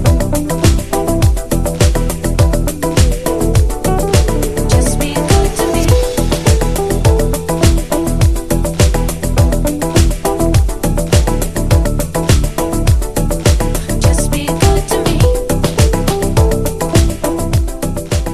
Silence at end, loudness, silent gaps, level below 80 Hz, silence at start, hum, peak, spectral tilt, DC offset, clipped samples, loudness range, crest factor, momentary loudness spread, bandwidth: 0 s; -14 LUFS; none; -16 dBFS; 0 s; none; 0 dBFS; -5.5 dB/octave; under 0.1%; under 0.1%; 1 LU; 12 dB; 4 LU; 14.5 kHz